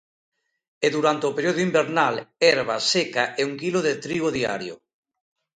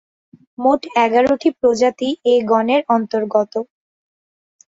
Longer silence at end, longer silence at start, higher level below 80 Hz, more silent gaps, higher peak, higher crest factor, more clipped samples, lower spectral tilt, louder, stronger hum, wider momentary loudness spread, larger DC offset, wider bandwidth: second, 0.85 s vs 1.05 s; first, 0.8 s vs 0.6 s; second, -64 dBFS vs -58 dBFS; neither; about the same, -2 dBFS vs -2 dBFS; first, 22 dB vs 16 dB; neither; about the same, -4 dB/octave vs -5 dB/octave; second, -22 LUFS vs -17 LUFS; neither; about the same, 6 LU vs 5 LU; neither; first, 9.4 kHz vs 7.8 kHz